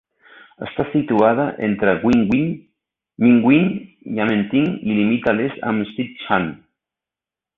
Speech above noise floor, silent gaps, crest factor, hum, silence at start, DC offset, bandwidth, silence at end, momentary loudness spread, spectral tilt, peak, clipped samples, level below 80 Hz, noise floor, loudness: 71 dB; none; 16 dB; none; 0.6 s; under 0.1%; 6.2 kHz; 1 s; 12 LU; -8.5 dB/octave; -2 dBFS; under 0.1%; -52 dBFS; -89 dBFS; -18 LUFS